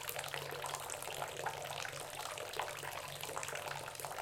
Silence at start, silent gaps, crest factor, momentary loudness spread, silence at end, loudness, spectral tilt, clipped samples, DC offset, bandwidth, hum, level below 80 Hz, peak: 0 s; none; 28 dB; 2 LU; 0 s; -42 LUFS; -1.5 dB/octave; under 0.1%; under 0.1%; 17 kHz; none; -72 dBFS; -16 dBFS